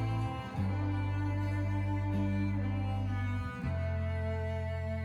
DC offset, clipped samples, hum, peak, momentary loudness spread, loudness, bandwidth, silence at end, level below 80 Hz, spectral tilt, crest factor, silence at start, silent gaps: under 0.1%; under 0.1%; none; -22 dBFS; 3 LU; -35 LUFS; 6.8 kHz; 0 s; -46 dBFS; -8.5 dB/octave; 10 dB; 0 s; none